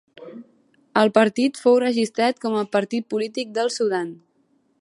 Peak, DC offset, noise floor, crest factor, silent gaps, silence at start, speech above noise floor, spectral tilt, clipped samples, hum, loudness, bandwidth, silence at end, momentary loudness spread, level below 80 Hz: -2 dBFS; under 0.1%; -64 dBFS; 20 dB; none; 0.2 s; 44 dB; -4.5 dB/octave; under 0.1%; none; -21 LUFS; 11.5 kHz; 0.65 s; 12 LU; -76 dBFS